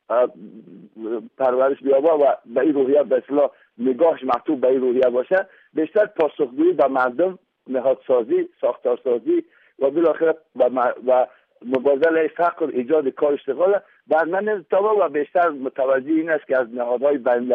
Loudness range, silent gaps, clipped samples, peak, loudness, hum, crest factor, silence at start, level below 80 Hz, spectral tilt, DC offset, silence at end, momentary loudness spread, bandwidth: 2 LU; none; under 0.1%; -8 dBFS; -20 LUFS; none; 12 dB; 0.1 s; -72 dBFS; -8 dB/octave; under 0.1%; 0 s; 6 LU; 4.6 kHz